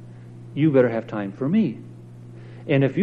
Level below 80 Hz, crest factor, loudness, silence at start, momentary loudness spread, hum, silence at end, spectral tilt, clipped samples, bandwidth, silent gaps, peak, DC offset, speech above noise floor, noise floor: -62 dBFS; 18 dB; -22 LUFS; 0 s; 23 LU; 60 Hz at -40 dBFS; 0 s; -9.5 dB/octave; under 0.1%; 5.2 kHz; none; -6 dBFS; under 0.1%; 20 dB; -41 dBFS